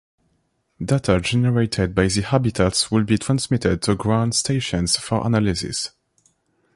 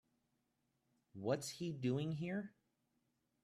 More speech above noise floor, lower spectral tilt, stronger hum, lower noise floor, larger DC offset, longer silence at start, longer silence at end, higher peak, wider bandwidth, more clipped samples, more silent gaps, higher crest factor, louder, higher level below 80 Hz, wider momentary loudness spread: first, 48 dB vs 43 dB; about the same, -5 dB/octave vs -6 dB/octave; neither; second, -68 dBFS vs -84 dBFS; neither; second, 0.8 s vs 1.15 s; about the same, 0.85 s vs 0.95 s; first, -4 dBFS vs -26 dBFS; second, 11.5 kHz vs 13.5 kHz; neither; neither; about the same, 18 dB vs 20 dB; first, -20 LUFS vs -42 LUFS; first, -40 dBFS vs -80 dBFS; second, 4 LU vs 10 LU